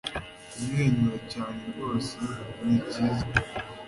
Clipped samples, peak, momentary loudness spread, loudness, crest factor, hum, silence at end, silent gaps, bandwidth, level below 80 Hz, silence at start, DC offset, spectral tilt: under 0.1%; -8 dBFS; 11 LU; -29 LUFS; 22 dB; none; 0 s; none; 11.5 kHz; -48 dBFS; 0.05 s; under 0.1%; -6 dB/octave